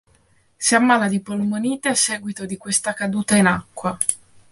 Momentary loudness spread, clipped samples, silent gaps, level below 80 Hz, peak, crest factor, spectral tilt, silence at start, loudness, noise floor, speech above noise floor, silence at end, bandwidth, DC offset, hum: 11 LU; under 0.1%; none; -56 dBFS; -2 dBFS; 20 dB; -3.5 dB/octave; 0.6 s; -20 LUFS; -58 dBFS; 38 dB; 0.35 s; 12 kHz; under 0.1%; none